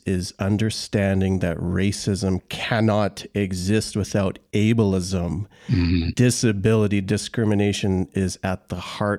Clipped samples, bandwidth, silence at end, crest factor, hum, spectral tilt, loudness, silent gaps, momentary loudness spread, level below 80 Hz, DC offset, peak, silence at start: under 0.1%; 14.5 kHz; 0 s; 16 dB; none; -6 dB/octave; -22 LUFS; none; 7 LU; -44 dBFS; under 0.1%; -6 dBFS; 0.05 s